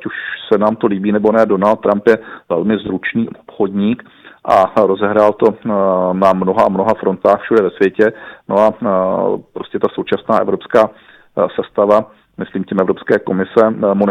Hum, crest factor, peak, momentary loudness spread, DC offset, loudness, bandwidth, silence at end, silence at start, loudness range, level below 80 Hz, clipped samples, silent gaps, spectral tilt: none; 14 dB; 0 dBFS; 8 LU; under 0.1%; -14 LUFS; 9.6 kHz; 0 s; 0 s; 3 LU; -52 dBFS; under 0.1%; none; -8 dB/octave